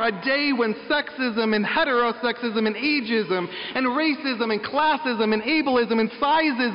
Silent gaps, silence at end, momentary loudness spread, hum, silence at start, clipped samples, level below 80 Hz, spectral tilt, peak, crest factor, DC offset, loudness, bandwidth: none; 0 s; 4 LU; none; 0 s; under 0.1%; -60 dBFS; -2 dB/octave; -12 dBFS; 10 dB; under 0.1%; -22 LUFS; 5.4 kHz